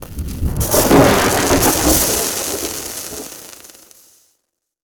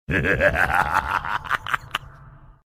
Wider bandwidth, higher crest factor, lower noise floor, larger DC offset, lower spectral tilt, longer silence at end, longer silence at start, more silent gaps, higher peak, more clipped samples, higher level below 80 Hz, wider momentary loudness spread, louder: first, over 20 kHz vs 16 kHz; about the same, 16 dB vs 20 dB; first, -71 dBFS vs -46 dBFS; neither; second, -3.5 dB/octave vs -5 dB/octave; first, 1.3 s vs 0.15 s; about the same, 0 s vs 0.1 s; neither; about the same, 0 dBFS vs -2 dBFS; neither; first, -30 dBFS vs -38 dBFS; first, 18 LU vs 8 LU; first, -14 LUFS vs -22 LUFS